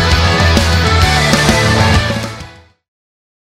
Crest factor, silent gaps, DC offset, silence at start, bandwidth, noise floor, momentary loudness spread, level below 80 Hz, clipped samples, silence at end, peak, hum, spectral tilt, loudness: 12 dB; none; under 0.1%; 0 s; 16 kHz; -34 dBFS; 10 LU; -22 dBFS; under 0.1%; 1 s; 0 dBFS; none; -4.5 dB/octave; -11 LUFS